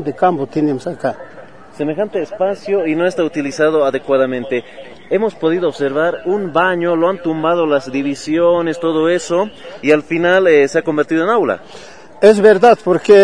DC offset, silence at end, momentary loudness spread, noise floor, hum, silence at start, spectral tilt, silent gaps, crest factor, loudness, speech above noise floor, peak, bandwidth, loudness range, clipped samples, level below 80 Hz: 0.8%; 0 s; 10 LU; -38 dBFS; none; 0 s; -6 dB/octave; none; 14 dB; -15 LUFS; 24 dB; 0 dBFS; 10.5 kHz; 5 LU; under 0.1%; -56 dBFS